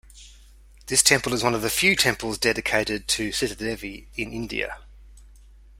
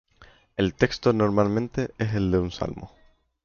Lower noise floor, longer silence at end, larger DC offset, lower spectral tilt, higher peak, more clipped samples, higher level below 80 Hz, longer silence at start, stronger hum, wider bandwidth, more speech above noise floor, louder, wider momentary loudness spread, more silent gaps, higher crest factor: second, -50 dBFS vs -55 dBFS; about the same, 0.5 s vs 0.55 s; neither; second, -2 dB/octave vs -7 dB/octave; first, 0 dBFS vs -4 dBFS; neither; about the same, -46 dBFS vs -44 dBFS; about the same, 0.15 s vs 0.2 s; neither; first, 16.5 kHz vs 7 kHz; second, 26 dB vs 31 dB; first, -22 LUFS vs -25 LUFS; first, 14 LU vs 11 LU; neither; about the same, 24 dB vs 22 dB